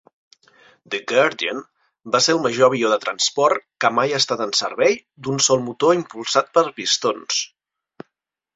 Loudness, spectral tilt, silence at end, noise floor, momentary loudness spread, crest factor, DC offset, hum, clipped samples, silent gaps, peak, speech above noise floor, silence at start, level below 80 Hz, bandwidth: -19 LUFS; -2.5 dB/octave; 1.1 s; -77 dBFS; 9 LU; 18 dB; under 0.1%; none; under 0.1%; none; -2 dBFS; 58 dB; 0.9 s; -66 dBFS; 8 kHz